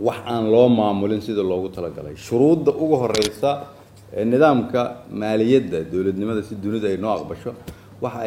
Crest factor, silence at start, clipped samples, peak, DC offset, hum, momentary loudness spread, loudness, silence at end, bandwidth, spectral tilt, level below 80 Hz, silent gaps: 18 dB; 0 s; under 0.1%; -2 dBFS; under 0.1%; none; 15 LU; -20 LUFS; 0 s; 16.5 kHz; -6.5 dB/octave; -52 dBFS; none